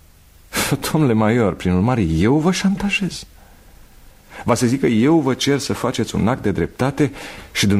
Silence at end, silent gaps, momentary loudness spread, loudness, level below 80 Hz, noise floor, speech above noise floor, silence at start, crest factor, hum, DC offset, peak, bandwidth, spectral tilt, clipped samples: 0 s; none; 6 LU; -18 LUFS; -40 dBFS; -47 dBFS; 30 dB; 0.5 s; 16 dB; none; under 0.1%; -2 dBFS; 16 kHz; -5.5 dB/octave; under 0.1%